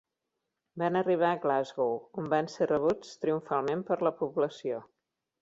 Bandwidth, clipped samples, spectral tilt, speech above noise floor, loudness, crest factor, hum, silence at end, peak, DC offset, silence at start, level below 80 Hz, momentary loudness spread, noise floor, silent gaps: 7.8 kHz; under 0.1%; -6.5 dB/octave; 55 dB; -30 LUFS; 18 dB; none; 0.6 s; -14 dBFS; under 0.1%; 0.75 s; -72 dBFS; 8 LU; -85 dBFS; none